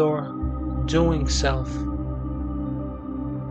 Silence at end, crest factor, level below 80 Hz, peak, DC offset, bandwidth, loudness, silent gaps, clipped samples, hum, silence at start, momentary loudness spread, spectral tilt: 0 s; 16 dB; -30 dBFS; -8 dBFS; under 0.1%; 8.6 kHz; -26 LUFS; none; under 0.1%; none; 0 s; 9 LU; -6 dB/octave